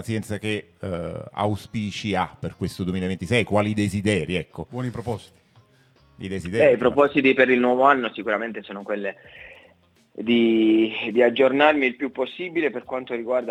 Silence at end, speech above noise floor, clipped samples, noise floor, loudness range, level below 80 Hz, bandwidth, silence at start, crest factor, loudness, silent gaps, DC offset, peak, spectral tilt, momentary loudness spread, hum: 0 s; 35 dB; under 0.1%; -58 dBFS; 6 LU; -58 dBFS; 13.5 kHz; 0 s; 22 dB; -22 LUFS; none; under 0.1%; -2 dBFS; -6 dB/octave; 14 LU; none